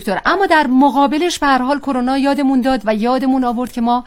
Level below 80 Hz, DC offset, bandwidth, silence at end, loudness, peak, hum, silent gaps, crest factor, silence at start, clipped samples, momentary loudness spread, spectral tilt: -42 dBFS; 0.1%; 15.5 kHz; 0 s; -15 LUFS; 0 dBFS; none; none; 14 dB; 0 s; under 0.1%; 5 LU; -4.5 dB/octave